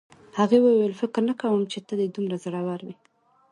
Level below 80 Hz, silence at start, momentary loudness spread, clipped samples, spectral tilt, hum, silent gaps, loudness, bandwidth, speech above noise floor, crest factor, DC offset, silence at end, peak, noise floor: -72 dBFS; 0.35 s; 14 LU; under 0.1%; -7 dB/octave; none; none; -24 LUFS; 11 kHz; 40 dB; 18 dB; under 0.1%; 0.6 s; -8 dBFS; -63 dBFS